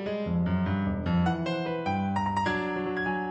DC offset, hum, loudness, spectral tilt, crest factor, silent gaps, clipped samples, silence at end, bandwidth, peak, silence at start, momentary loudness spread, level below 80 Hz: under 0.1%; none; -29 LUFS; -7.5 dB/octave; 12 dB; none; under 0.1%; 0 s; 8.4 kHz; -16 dBFS; 0 s; 3 LU; -48 dBFS